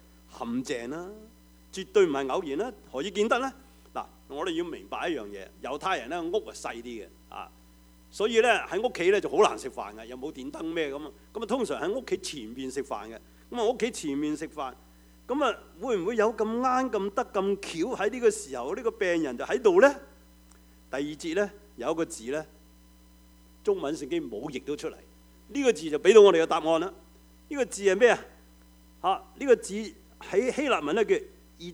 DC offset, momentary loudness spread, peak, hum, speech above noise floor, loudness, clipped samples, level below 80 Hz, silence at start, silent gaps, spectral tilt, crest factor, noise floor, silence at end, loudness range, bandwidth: under 0.1%; 17 LU; -4 dBFS; none; 28 dB; -28 LUFS; under 0.1%; -58 dBFS; 0.35 s; none; -4 dB/octave; 24 dB; -55 dBFS; 0 s; 9 LU; 16 kHz